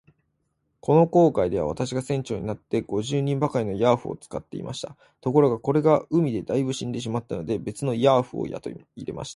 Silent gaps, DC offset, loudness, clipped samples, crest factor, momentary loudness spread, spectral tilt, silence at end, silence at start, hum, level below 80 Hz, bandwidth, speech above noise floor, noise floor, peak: none; under 0.1%; -24 LUFS; under 0.1%; 20 dB; 14 LU; -7 dB/octave; 0 s; 0.85 s; none; -54 dBFS; 11.5 kHz; 50 dB; -74 dBFS; -4 dBFS